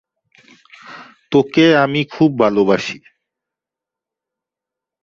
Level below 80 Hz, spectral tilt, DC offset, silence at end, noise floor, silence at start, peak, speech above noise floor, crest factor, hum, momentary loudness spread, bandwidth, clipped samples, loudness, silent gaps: -58 dBFS; -6.5 dB/octave; under 0.1%; 2.05 s; -86 dBFS; 0.9 s; -2 dBFS; 72 dB; 18 dB; none; 24 LU; 7.4 kHz; under 0.1%; -15 LUFS; none